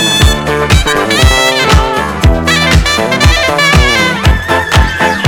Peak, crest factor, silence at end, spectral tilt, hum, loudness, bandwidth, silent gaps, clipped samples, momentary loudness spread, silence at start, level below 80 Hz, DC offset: 0 dBFS; 8 dB; 0 s; -4 dB/octave; none; -9 LUFS; over 20 kHz; none; 2%; 4 LU; 0 s; -14 dBFS; under 0.1%